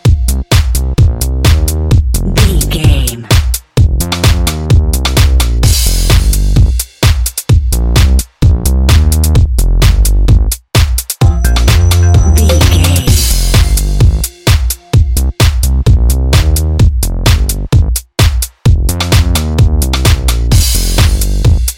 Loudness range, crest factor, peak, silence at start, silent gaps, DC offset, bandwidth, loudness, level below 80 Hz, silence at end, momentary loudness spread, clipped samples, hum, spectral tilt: 2 LU; 8 dB; 0 dBFS; 0.05 s; none; under 0.1%; 17 kHz; -10 LUFS; -10 dBFS; 0 s; 4 LU; 0.8%; none; -4.5 dB/octave